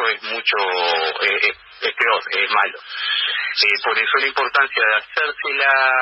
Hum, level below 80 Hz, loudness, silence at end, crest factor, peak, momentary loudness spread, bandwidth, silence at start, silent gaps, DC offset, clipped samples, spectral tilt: none; -66 dBFS; -17 LUFS; 0 s; 16 dB; -4 dBFS; 5 LU; 8.4 kHz; 0 s; none; under 0.1%; under 0.1%; -1.5 dB/octave